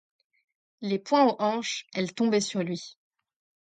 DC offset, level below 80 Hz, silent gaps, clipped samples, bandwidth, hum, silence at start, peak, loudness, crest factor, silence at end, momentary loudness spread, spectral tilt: under 0.1%; -76 dBFS; none; under 0.1%; 9.4 kHz; none; 0.8 s; -10 dBFS; -27 LUFS; 20 dB; 0.7 s; 13 LU; -4.5 dB/octave